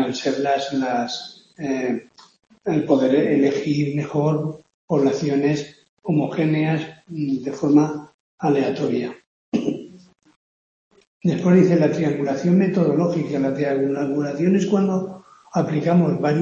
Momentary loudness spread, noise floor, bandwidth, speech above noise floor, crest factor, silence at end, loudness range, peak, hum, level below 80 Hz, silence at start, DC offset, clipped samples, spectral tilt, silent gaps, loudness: 11 LU; under -90 dBFS; 7.4 kHz; over 70 dB; 18 dB; 0 s; 4 LU; -2 dBFS; none; -64 dBFS; 0 s; under 0.1%; under 0.1%; -7.5 dB/octave; 4.74-4.88 s, 5.89-5.97 s, 8.14-8.38 s, 9.27-9.52 s, 10.36-10.91 s, 11.07-11.20 s; -21 LUFS